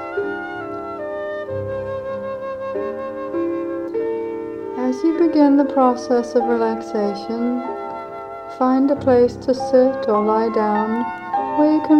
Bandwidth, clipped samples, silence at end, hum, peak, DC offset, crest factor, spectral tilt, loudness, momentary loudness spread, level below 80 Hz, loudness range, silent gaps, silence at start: 9 kHz; under 0.1%; 0 s; none; -2 dBFS; under 0.1%; 16 dB; -7 dB/octave; -20 LUFS; 12 LU; -54 dBFS; 8 LU; none; 0 s